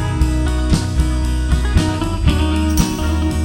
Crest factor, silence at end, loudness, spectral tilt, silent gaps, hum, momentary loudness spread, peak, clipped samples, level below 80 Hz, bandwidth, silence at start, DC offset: 14 dB; 0 s; -17 LUFS; -6 dB/octave; none; none; 2 LU; 0 dBFS; under 0.1%; -18 dBFS; 17.5 kHz; 0 s; under 0.1%